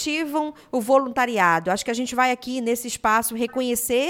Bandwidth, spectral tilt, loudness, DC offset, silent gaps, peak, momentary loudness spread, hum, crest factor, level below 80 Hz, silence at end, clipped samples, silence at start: 17.5 kHz; -3 dB/octave; -22 LUFS; under 0.1%; none; -4 dBFS; 7 LU; none; 18 dB; -56 dBFS; 0 s; under 0.1%; 0 s